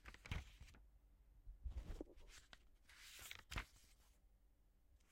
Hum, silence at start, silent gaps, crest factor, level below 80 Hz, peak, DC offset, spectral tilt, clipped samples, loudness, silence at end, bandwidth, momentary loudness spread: none; 0 s; none; 26 dB; -60 dBFS; -32 dBFS; under 0.1%; -4 dB/octave; under 0.1%; -56 LUFS; 0 s; 16 kHz; 15 LU